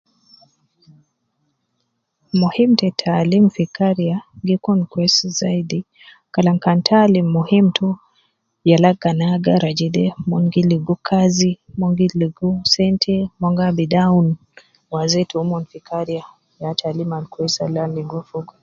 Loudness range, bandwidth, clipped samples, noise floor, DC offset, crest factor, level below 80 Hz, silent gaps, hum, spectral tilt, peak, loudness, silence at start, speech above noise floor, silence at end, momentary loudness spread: 6 LU; 7.6 kHz; under 0.1%; -71 dBFS; under 0.1%; 18 dB; -54 dBFS; none; none; -6 dB/octave; 0 dBFS; -18 LUFS; 2.35 s; 54 dB; 0.2 s; 11 LU